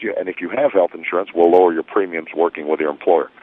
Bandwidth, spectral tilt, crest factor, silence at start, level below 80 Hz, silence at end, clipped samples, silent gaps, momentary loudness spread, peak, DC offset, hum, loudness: 3.9 kHz; -8 dB/octave; 16 dB; 0 s; -66 dBFS; 0.15 s; under 0.1%; none; 10 LU; 0 dBFS; under 0.1%; none; -18 LUFS